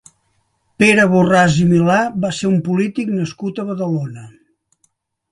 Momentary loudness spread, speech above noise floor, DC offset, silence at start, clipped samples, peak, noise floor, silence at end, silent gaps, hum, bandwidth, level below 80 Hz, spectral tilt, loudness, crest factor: 12 LU; 49 dB; under 0.1%; 0.8 s; under 0.1%; 0 dBFS; -64 dBFS; 1.05 s; none; none; 11.5 kHz; -50 dBFS; -6 dB/octave; -15 LUFS; 16 dB